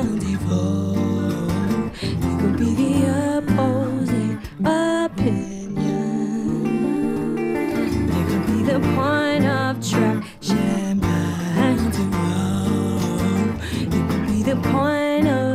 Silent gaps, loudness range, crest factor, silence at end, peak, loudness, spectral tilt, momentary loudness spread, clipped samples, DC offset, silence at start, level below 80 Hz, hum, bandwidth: none; 2 LU; 14 dB; 0 s; -6 dBFS; -21 LUFS; -6.5 dB/octave; 4 LU; under 0.1%; under 0.1%; 0 s; -40 dBFS; none; 15.5 kHz